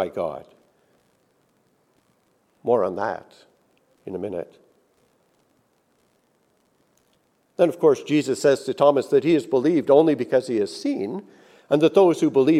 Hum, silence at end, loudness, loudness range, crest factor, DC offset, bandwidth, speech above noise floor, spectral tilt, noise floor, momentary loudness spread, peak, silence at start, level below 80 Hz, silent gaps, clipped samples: none; 0 s; -21 LUFS; 19 LU; 20 dB; under 0.1%; 13.5 kHz; 45 dB; -6.5 dB/octave; -65 dBFS; 17 LU; -4 dBFS; 0 s; -72 dBFS; none; under 0.1%